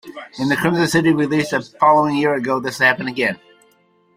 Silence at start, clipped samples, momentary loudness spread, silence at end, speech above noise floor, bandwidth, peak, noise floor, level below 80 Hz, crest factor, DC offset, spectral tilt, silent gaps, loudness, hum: 0.05 s; under 0.1%; 8 LU; 0.8 s; 40 dB; 16 kHz; 0 dBFS; -57 dBFS; -56 dBFS; 18 dB; under 0.1%; -5.5 dB/octave; none; -17 LUFS; none